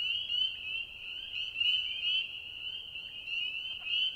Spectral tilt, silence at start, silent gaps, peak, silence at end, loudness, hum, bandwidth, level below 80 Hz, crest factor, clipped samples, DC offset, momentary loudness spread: 0 dB/octave; 0 s; none; -20 dBFS; 0 s; -33 LUFS; none; 16 kHz; -66 dBFS; 16 dB; under 0.1%; under 0.1%; 11 LU